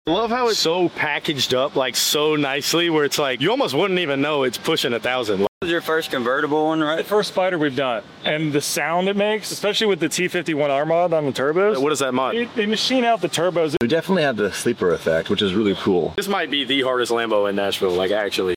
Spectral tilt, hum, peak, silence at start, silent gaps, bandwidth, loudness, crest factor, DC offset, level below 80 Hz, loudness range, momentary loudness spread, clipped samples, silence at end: -3.5 dB/octave; none; -8 dBFS; 0.05 s; 5.48-5.61 s; 17 kHz; -20 LUFS; 12 dB; under 0.1%; -58 dBFS; 2 LU; 3 LU; under 0.1%; 0 s